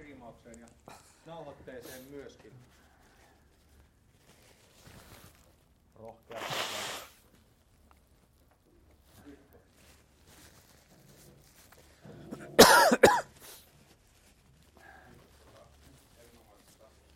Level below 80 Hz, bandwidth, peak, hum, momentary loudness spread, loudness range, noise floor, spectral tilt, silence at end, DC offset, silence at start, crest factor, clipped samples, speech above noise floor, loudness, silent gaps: -64 dBFS; 16.5 kHz; -4 dBFS; none; 33 LU; 25 LU; -65 dBFS; -2.5 dB/octave; 3.95 s; under 0.1%; 1.3 s; 30 dB; under 0.1%; 20 dB; -24 LUFS; none